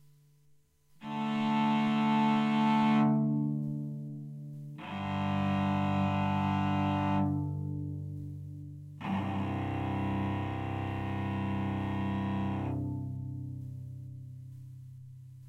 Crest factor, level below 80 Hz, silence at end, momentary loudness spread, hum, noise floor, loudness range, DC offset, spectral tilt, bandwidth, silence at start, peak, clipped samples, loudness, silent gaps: 14 dB; -58 dBFS; 0 s; 18 LU; none; -65 dBFS; 7 LU; under 0.1%; -8 dB/octave; 8.8 kHz; 1 s; -18 dBFS; under 0.1%; -32 LUFS; none